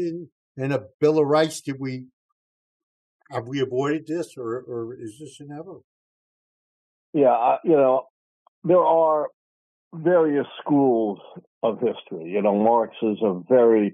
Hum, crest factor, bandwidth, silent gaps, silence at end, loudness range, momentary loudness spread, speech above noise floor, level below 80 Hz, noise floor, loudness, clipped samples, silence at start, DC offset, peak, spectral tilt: none; 16 dB; 12 kHz; 0.32-0.55 s, 0.94-0.99 s, 2.13-3.20 s, 5.84-7.13 s, 8.10-8.62 s, 9.34-9.91 s, 11.47-11.61 s; 0 s; 9 LU; 19 LU; over 68 dB; -76 dBFS; under -90 dBFS; -22 LUFS; under 0.1%; 0 s; under 0.1%; -6 dBFS; -7 dB/octave